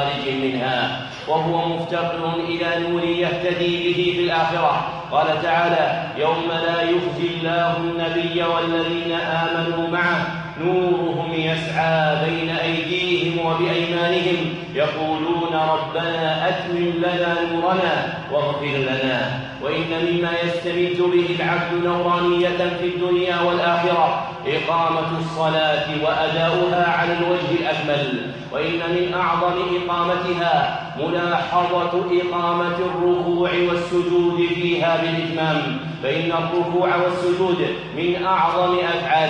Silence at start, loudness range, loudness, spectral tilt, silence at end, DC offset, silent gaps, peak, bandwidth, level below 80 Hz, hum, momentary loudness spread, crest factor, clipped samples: 0 s; 2 LU; -20 LUFS; -6.5 dB/octave; 0 s; under 0.1%; none; -6 dBFS; 8.8 kHz; -54 dBFS; none; 4 LU; 14 dB; under 0.1%